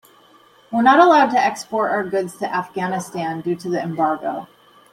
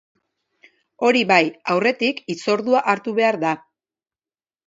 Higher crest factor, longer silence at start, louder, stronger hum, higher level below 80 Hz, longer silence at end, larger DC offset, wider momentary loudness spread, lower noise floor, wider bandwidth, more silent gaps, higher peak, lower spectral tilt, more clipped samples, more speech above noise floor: about the same, 18 dB vs 22 dB; second, 0.7 s vs 1 s; about the same, -19 LUFS vs -19 LUFS; neither; first, -66 dBFS vs -72 dBFS; second, 0.5 s vs 1.1 s; neither; first, 13 LU vs 8 LU; second, -51 dBFS vs under -90 dBFS; first, 16 kHz vs 7.8 kHz; neither; about the same, -2 dBFS vs 0 dBFS; about the same, -5.5 dB/octave vs -4.5 dB/octave; neither; second, 33 dB vs over 71 dB